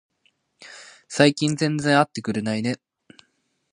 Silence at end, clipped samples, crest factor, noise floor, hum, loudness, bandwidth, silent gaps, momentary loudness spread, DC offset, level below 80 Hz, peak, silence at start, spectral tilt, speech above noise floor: 0.95 s; under 0.1%; 24 dB; -69 dBFS; none; -22 LUFS; 11.5 kHz; none; 23 LU; under 0.1%; -66 dBFS; 0 dBFS; 0.6 s; -5 dB/octave; 48 dB